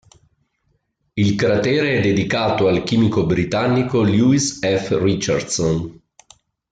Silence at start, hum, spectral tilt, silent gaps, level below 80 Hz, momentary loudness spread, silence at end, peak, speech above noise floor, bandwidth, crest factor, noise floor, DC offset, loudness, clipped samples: 1.15 s; none; -5.5 dB/octave; none; -48 dBFS; 5 LU; 0.8 s; -6 dBFS; 50 dB; 9.4 kHz; 14 dB; -67 dBFS; under 0.1%; -18 LUFS; under 0.1%